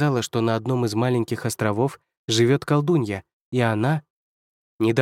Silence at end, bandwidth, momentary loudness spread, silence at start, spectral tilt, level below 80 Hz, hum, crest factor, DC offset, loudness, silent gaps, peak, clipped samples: 0 s; 16 kHz; 9 LU; 0 s; -6 dB/octave; -64 dBFS; none; 18 dB; under 0.1%; -23 LUFS; 2.17-2.28 s, 3.33-3.52 s, 4.10-4.79 s; -4 dBFS; under 0.1%